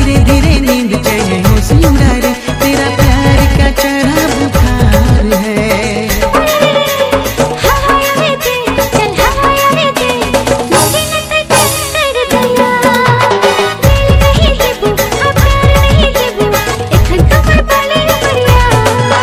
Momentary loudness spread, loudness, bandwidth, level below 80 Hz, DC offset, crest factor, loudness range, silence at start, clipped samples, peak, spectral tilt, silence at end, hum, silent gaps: 4 LU; -9 LUFS; 16.5 kHz; -16 dBFS; under 0.1%; 8 dB; 1 LU; 0 s; 2%; 0 dBFS; -4.5 dB/octave; 0 s; none; none